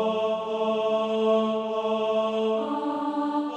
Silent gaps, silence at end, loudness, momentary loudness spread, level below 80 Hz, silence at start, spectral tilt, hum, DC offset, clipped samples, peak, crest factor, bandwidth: none; 0 s; -26 LUFS; 4 LU; -74 dBFS; 0 s; -6 dB/octave; none; under 0.1%; under 0.1%; -14 dBFS; 12 dB; 8.4 kHz